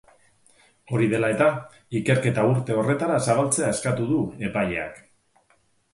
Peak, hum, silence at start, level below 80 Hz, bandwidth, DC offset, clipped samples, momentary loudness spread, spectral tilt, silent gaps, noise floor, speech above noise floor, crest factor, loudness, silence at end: -6 dBFS; none; 0.9 s; -56 dBFS; 11.5 kHz; under 0.1%; under 0.1%; 8 LU; -5.5 dB/octave; none; -64 dBFS; 42 dB; 18 dB; -23 LUFS; 0.95 s